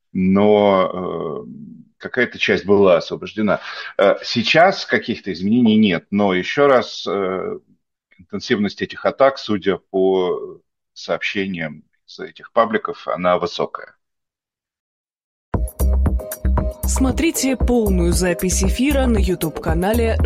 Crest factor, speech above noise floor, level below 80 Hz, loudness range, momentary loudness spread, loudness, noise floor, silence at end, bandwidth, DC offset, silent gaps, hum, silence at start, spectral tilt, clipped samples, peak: 18 dB; 71 dB; -28 dBFS; 7 LU; 13 LU; -18 LUFS; -89 dBFS; 0 s; 16 kHz; under 0.1%; 14.80-15.05 s, 15.24-15.52 s; none; 0.15 s; -5 dB/octave; under 0.1%; 0 dBFS